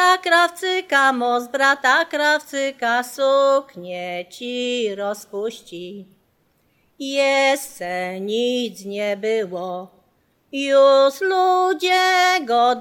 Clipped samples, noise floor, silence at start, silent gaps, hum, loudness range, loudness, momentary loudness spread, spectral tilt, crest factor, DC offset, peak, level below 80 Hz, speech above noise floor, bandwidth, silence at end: under 0.1%; -63 dBFS; 0 s; none; none; 7 LU; -19 LUFS; 14 LU; -2.5 dB/octave; 18 dB; under 0.1%; -2 dBFS; -74 dBFS; 44 dB; 17.5 kHz; 0 s